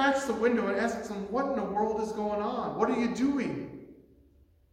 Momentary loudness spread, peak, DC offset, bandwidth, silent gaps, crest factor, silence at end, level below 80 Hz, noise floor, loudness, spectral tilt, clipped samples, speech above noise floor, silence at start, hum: 8 LU; -12 dBFS; under 0.1%; 15 kHz; none; 18 dB; 0.8 s; -60 dBFS; -62 dBFS; -30 LUFS; -5.5 dB/octave; under 0.1%; 32 dB; 0 s; none